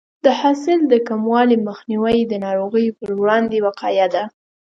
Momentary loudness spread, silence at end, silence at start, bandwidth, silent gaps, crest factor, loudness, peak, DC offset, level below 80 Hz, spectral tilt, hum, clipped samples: 6 LU; 0.45 s; 0.25 s; 7.6 kHz; none; 16 dB; -17 LUFS; 0 dBFS; under 0.1%; -56 dBFS; -6 dB/octave; none; under 0.1%